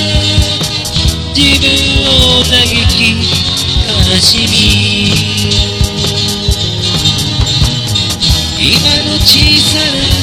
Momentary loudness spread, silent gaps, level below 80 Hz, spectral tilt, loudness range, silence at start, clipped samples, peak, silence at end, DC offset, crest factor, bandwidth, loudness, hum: 6 LU; none; -20 dBFS; -3.5 dB/octave; 3 LU; 0 s; 1%; 0 dBFS; 0 s; 0.6%; 10 dB; over 20 kHz; -8 LUFS; none